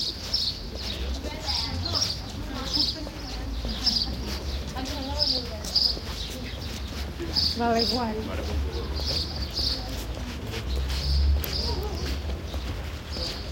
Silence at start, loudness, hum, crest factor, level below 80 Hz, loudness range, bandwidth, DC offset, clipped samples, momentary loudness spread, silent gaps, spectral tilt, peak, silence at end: 0 s; -28 LUFS; none; 20 dB; -34 dBFS; 3 LU; 17 kHz; under 0.1%; under 0.1%; 10 LU; none; -4 dB/octave; -10 dBFS; 0 s